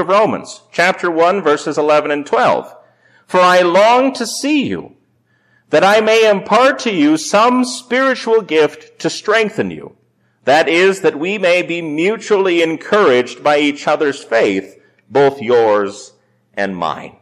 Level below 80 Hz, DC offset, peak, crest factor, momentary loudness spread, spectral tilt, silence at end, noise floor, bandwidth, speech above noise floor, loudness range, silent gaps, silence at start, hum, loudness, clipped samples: -60 dBFS; under 0.1%; -4 dBFS; 10 dB; 11 LU; -4 dB/octave; 0.1 s; -58 dBFS; 14 kHz; 45 dB; 3 LU; none; 0 s; none; -14 LUFS; under 0.1%